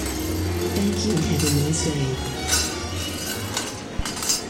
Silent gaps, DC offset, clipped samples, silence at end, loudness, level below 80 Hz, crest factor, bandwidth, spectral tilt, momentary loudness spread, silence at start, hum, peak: none; under 0.1%; under 0.1%; 0 s; -24 LUFS; -36 dBFS; 18 dB; 17 kHz; -4 dB/octave; 7 LU; 0 s; none; -6 dBFS